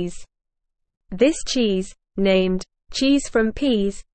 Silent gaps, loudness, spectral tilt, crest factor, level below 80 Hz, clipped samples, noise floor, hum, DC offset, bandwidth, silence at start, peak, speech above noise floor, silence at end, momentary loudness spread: none; -21 LUFS; -5 dB/octave; 18 dB; -42 dBFS; under 0.1%; -77 dBFS; none; under 0.1%; 8.8 kHz; 0 s; -4 dBFS; 57 dB; 0.15 s; 12 LU